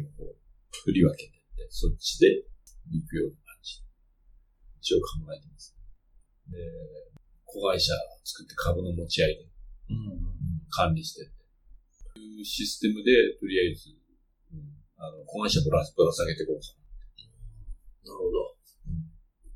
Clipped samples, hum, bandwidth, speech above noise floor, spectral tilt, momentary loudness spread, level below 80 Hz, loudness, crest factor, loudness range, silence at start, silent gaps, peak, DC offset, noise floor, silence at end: under 0.1%; none; 17.5 kHz; 38 dB; -5 dB/octave; 24 LU; -42 dBFS; -28 LUFS; 22 dB; 8 LU; 0 s; none; -8 dBFS; under 0.1%; -65 dBFS; 0 s